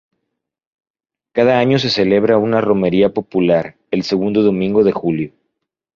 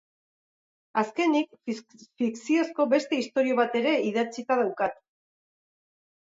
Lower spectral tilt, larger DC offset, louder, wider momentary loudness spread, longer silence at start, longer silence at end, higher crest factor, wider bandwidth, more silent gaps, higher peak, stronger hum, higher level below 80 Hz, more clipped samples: first, -7 dB/octave vs -4.5 dB/octave; neither; first, -15 LUFS vs -27 LUFS; about the same, 8 LU vs 7 LU; first, 1.35 s vs 0.95 s; second, 0.65 s vs 1.25 s; about the same, 14 dB vs 18 dB; about the same, 7.2 kHz vs 7.8 kHz; neither; first, -2 dBFS vs -10 dBFS; neither; first, -52 dBFS vs -78 dBFS; neither